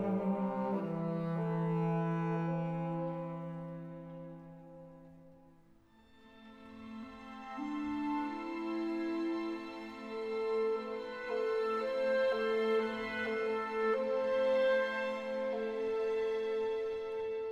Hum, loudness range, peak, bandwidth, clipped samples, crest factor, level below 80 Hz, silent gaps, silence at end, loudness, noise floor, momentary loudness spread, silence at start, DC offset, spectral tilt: none; 15 LU; -22 dBFS; 8.4 kHz; under 0.1%; 14 dB; -70 dBFS; none; 0 s; -35 LUFS; -64 dBFS; 16 LU; 0 s; under 0.1%; -8 dB/octave